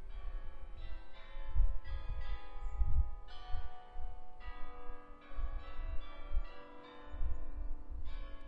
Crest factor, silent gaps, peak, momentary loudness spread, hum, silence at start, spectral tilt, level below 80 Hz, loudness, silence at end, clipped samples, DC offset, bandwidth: 16 dB; none; -18 dBFS; 14 LU; none; 0 s; -7.5 dB/octave; -40 dBFS; -46 LUFS; 0 s; under 0.1%; under 0.1%; 4.6 kHz